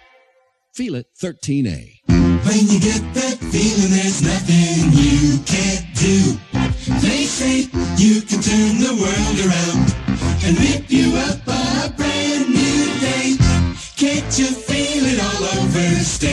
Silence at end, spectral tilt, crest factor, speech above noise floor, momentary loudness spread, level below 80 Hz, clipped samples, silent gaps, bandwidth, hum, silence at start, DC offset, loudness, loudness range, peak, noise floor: 0 s; -4.5 dB/octave; 14 dB; 43 dB; 7 LU; -30 dBFS; under 0.1%; none; 12 kHz; none; 0.75 s; under 0.1%; -17 LUFS; 2 LU; -2 dBFS; -59 dBFS